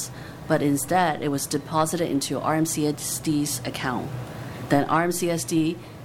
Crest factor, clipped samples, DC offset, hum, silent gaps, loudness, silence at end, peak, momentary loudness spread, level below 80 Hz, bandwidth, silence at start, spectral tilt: 18 dB; under 0.1%; under 0.1%; none; none; -24 LUFS; 0 s; -6 dBFS; 10 LU; -54 dBFS; 17.5 kHz; 0 s; -4.5 dB/octave